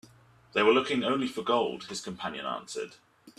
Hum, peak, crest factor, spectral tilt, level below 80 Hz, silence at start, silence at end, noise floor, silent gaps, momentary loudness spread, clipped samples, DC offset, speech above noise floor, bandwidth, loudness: none; -10 dBFS; 20 dB; -4 dB/octave; -70 dBFS; 0.55 s; 0.1 s; -58 dBFS; none; 14 LU; under 0.1%; under 0.1%; 29 dB; 13 kHz; -29 LUFS